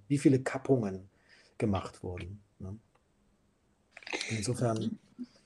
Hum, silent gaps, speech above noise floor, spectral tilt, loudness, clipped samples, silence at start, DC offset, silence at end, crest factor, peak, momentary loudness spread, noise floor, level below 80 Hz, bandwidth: none; none; 39 dB; -6 dB/octave; -32 LUFS; under 0.1%; 0.1 s; under 0.1%; 0.2 s; 22 dB; -12 dBFS; 20 LU; -71 dBFS; -64 dBFS; 12 kHz